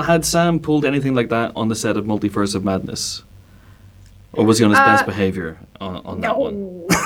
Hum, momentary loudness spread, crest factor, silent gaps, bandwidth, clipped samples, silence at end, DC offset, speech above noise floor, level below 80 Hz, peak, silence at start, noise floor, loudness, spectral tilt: none; 16 LU; 18 dB; none; 18.5 kHz; under 0.1%; 0 s; under 0.1%; 27 dB; -46 dBFS; -2 dBFS; 0 s; -45 dBFS; -18 LUFS; -5 dB/octave